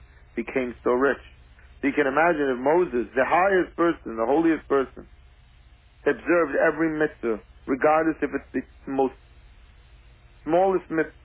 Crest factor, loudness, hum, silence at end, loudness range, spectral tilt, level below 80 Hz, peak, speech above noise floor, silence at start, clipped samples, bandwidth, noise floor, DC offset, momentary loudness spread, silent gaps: 16 dB; -24 LUFS; none; 0.15 s; 4 LU; -10 dB/octave; -52 dBFS; -8 dBFS; 30 dB; 0.35 s; under 0.1%; 4 kHz; -53 dBFS; under 0.1%; 10 LU; none